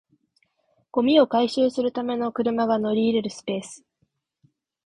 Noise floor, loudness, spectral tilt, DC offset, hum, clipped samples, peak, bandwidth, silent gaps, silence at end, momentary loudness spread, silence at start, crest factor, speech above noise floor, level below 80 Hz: -72 dBFS; -23 LUFS; -5.5 dB/octave; under 0.1%; none; under 0.1%; -4 dBFS; 10.5 kHz; none; 1.1 s; 12 LU; 0.95 s; 20 dB; 50 dB; -64 dBFS